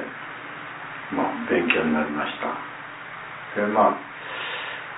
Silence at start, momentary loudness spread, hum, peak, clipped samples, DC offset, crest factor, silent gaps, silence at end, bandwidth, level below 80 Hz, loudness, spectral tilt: 0 s; 15 LU; none; -4 dBFS; under 0.1%; under 0.1%; 22 dB; none; 0 s; 4 kHz; -62 dBFS; -26 LUFS; -8.5 dB/octave